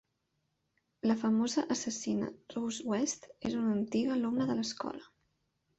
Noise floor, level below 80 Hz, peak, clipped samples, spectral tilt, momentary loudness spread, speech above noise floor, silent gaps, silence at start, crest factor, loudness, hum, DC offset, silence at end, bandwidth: -81 dBFS; -70 dBFS; -18 dBFS; under 0.1%; -4.5 dB/octave; 9 LU; 48 dB; none; 1.05 s; 18 dB; -34 LUFS; none; under 0.1%; 0.75 s; 8.2 kHz